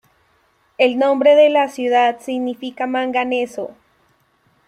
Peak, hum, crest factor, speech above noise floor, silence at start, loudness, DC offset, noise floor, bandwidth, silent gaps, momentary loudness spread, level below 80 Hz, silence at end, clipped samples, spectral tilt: -2 dBFS; none; 16 dB; 44 dB; 0.8 s; -17 LUFS; under 0.1%; -60 dBFS; 11.5 kHz; none; 13 LU; -66 dBFS; 0.95 s; under 0.1%; -3.5 dB/octave